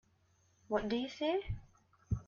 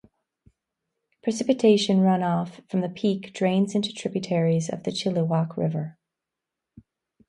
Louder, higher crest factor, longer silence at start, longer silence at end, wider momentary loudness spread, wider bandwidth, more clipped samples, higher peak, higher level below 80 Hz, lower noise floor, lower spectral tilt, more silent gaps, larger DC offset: second, -38 LUFS vs -24 LUFS; about the same, 18 dB vs 18 dB; second, 0.7 s vs 1.25 s; second, 0.05 s vs 1.35 s; about the same, 10 LU vs 10 LU; second, 7.4 kHz vs 11 kHz; neither; second, -20 dBFS vs -6 dBFS; first, -52 dBFS vs -68 dBFS; second, -72 dBFS vs -86 dBFS; about the same, -7 dB/octave vs -6.5 dB/octave; neither; neither